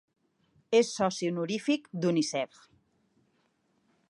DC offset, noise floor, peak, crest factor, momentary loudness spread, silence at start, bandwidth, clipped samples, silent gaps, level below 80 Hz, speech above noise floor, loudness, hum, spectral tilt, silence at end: under 0.1%; -73 dBFS; -12 dBFS; 20 dB; 6 LU; 0.7 s; 11.5 kHz; under 0.1%; none; -76 dBFS; 44 dB; -29 LUFS; none; -5 dB/octave; 1.65 s